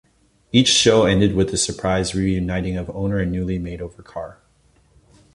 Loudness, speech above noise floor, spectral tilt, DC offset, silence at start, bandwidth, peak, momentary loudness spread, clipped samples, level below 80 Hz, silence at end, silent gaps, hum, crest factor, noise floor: -19 LUFS; 38 dB; -4.5 dB/octave; under 0.1%; 0.55 s; 11.5 kHz; -2 dBFS; 20 LU; under 0.1%; -38 dBFS; 1.05 s; none; none; 18 dB; -58 dBFS